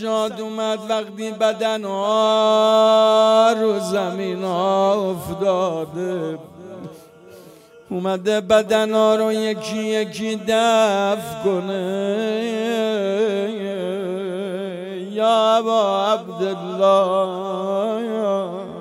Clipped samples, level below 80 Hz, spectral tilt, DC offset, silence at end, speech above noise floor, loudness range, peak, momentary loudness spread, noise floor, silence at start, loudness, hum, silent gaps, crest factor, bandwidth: under 0.1%; -62 dBFS; -5 dB/octave; under 0.1%; 0 s; 26 dB; 6 LU; -4 dBFS; 11 LU; -45 dBFS; 0 s; -19 LUFS; none; none; 16 dB; 15.5 kHz